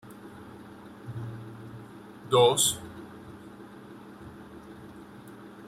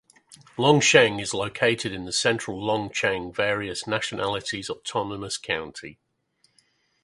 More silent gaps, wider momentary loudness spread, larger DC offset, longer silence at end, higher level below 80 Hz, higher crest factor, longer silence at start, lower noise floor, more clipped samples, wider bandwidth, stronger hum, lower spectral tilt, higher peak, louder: neither; first, 25 LU vs 13 LU; neither; second, 0 s vs 1.1 s; second, -64 dBFS vs -58 dBFS; about the same, 22 dB vs 24 dB; second, 0.05 s vs 0.3 s; second, -47 dBFS vs -68 dBFS; neither; first, 16 kHz vs 11.5 kHz; neither; about the same, -3 dB/octave vs -3.5 dB/octave; second, -10 dBFS vs -2 dBFS; about the same, -25 LUFS vs -24 LUFS